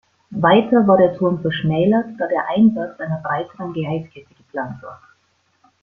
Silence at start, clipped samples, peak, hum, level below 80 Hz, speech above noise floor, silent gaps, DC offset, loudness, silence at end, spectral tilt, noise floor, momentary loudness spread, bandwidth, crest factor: 0.3 s; under 0.1%; -2 dBFS; none; -56 dBFS; 46 dB; none; under 0.1%; -18 LUFS; 0.85 s; -9.5 dB/octave; -63 dBFS; 16 LU; 3.7 kHz; 18 dB